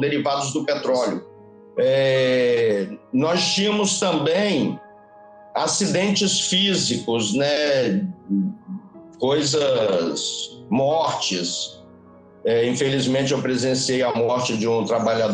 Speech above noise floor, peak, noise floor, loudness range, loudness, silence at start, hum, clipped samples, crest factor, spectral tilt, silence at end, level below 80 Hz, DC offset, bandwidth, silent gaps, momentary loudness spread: 27 dB; -8 dBFS; -47 dBFS; 3 LU; -21 LUFS; 0 s; none; under 0.1%; 14 dB; -4 dB/octave; 0 s; -64 dBFS; under 0.1%; 10 kHz; none; 8 LU